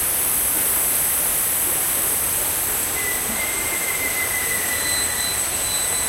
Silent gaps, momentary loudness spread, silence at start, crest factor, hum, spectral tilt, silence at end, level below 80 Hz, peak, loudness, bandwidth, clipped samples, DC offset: none; 3 LU; 0 s; 14 dB; none; 0 dB/octave; 0 s; -44 dBFS; -8 dBFS; -18 LUFS; 16 kHz; under 0.1%; under 0.1%